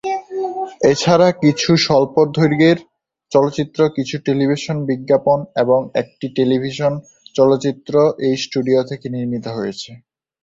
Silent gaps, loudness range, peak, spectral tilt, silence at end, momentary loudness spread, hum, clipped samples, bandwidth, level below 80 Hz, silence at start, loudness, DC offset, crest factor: none; 3 LU; -2 dBFS; -6 dB/octave; 0.45 s; 11 LU; none; under 0.1%; 7.8 kHz; -54 dBFS; 0.05 s; -17 LUFS; under 0.1%; 16 dB